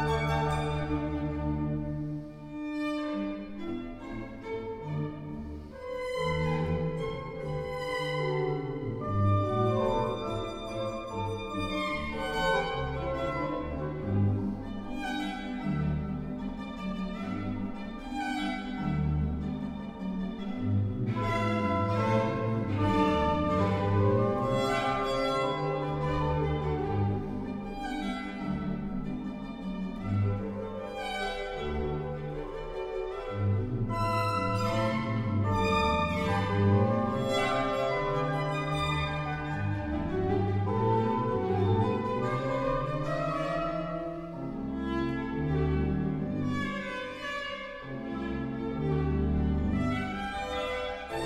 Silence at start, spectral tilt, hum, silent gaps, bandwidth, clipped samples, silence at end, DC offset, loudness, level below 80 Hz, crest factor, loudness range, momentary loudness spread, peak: 0 s; -7 dB/octave; none; none; 13 kHz; under 0.1%; 0 s; under 0.1%; -31 LUFS; -44 dBFS; 16 dB; 7 LU; 10 LU; -14 dBFS